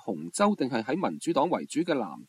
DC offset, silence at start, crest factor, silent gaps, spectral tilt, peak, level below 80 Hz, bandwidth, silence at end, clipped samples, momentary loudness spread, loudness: under 0.1%; 0.05 s; 18 dB; none; -5 dB/octave; -10 dBFS; -74 dBFS; 14 kHz; 0.05 s; under 0.1%; 4 LU; -28 LUFS